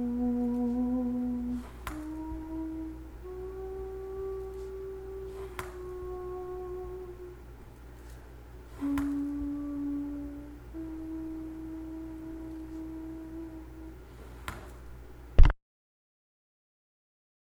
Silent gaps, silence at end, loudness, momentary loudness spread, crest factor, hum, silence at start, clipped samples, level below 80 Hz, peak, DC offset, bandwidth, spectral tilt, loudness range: none; 1.95 s; -36 LUFS; 19 LU; 28 dB; none; 0 s; under 0.1%; -36 dBFS; -4 dBFS; under 0.1%; 13 kHz; -8 dB/octave; 7 LU